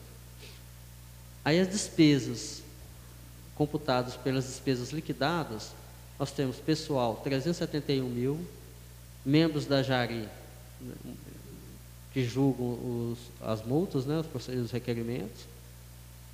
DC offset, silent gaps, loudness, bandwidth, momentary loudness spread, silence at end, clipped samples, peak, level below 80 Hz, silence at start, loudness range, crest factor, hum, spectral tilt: under 0.1%; none; -31 LUFS; 15.5 kHz; 22 LU; 0 s; under 0.1%; -12 dBFS; -54 dBFS; 0 s; 4 LU; 20 dB; 60 Hz at -50 dBFS; -5.5 dB/octave